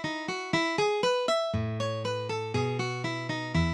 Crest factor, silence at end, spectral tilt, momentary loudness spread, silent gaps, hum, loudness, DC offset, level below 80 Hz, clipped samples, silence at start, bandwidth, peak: 16 dB; 0 s; -5 dB/octave; 6 LU; none; none; -29 LUFS; under 0.1%; -50 dBFS; under 0.1%; 0 s; 12 kHz; -14 dBFS